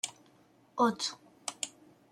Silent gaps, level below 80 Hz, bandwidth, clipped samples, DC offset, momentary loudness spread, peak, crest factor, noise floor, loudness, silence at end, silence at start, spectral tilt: none; -82 dBFS; 16 kHz; under 0.1%; under 0.1%; 13 LU; -16 dBFS; 20 dB; -64 dBFS; -34 LUFS; 0.4 s; 0.05 s; -2.5 dB/octave